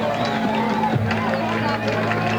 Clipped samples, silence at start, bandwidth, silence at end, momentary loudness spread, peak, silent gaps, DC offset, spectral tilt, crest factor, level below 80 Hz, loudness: under 0.1%; 0 s; over 20 kHz; 0 s; 1 LU; -6 dBFS; none; under 0.1%; -6.5 dB/octave; 14 dB; -50 dBFS; -21 LUFS